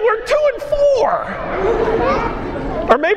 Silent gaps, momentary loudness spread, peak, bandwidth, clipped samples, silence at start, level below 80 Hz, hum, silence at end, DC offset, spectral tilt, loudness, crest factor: none; 8 LU; 0 dBFS; 11.5 kHz; under 0.1%; 0 s; -32 dBFS; none; 0 s; under 0.1%; -5.5 dB/octave; -17 LUFS; 16 dB